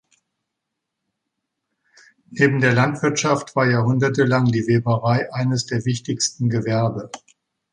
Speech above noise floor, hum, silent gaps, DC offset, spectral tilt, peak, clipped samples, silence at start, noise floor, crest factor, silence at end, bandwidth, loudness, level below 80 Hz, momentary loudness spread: 61 dB; none; none; under 0.1%; -5.5 dB/octave; -2 dBFS; under 0.1%; 2.3 s; -80 dBFS; 18 dB; 0.55 s; 10.5 kHz; -19 LUFS; -58 dBFS; 7 LU